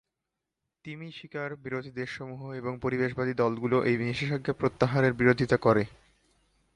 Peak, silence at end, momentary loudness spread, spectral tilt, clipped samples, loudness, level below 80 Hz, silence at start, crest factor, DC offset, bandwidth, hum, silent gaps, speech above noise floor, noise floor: -8 dBFS; 0.9 s; 15 LU; -7.5 dB/octave; under 0.1%; -28 LUFS; -58 dBFS; 0.85 s; 22 dB; under 0.1%; 11 kHz; none; none; 58 dB; -86 dBFS